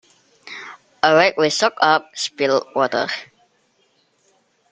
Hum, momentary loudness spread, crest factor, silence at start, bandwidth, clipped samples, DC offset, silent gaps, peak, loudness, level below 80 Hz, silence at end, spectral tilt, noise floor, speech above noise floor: none; 20 LU; 20 dB; 0.45 s; 9.4 kHz; under 0.1%; under 0.1%; none; -2 dBFS; -18 LUFS; -66 dBFS; 1.5 s; -3 dB/octave; -63 dBFS; 45 dB